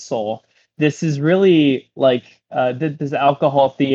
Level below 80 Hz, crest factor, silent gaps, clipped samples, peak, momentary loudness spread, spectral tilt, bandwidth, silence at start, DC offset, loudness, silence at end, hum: -66 dBFS; 16 dB; none; under 0.1%; -2 dBFS; 10 LU; -7 dB/octave; 7.8 kHz; 0 s; under 0.1%; -17 LUFS; 0 s; none